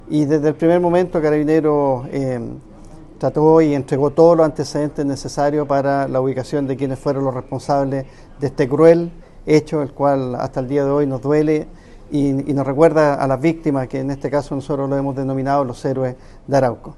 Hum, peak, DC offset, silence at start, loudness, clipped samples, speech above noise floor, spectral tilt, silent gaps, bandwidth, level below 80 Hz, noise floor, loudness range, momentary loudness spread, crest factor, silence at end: none; 0 dBFS; under 0.1%; 0.05 s; -18 LUFS; under 0.1%; 21 dB; -7.5 dB/octave; none; 11.5 kHz; -42 dBFS; -38 dBFS; 4 LU; 10 LU; 18 dB; 0.05 s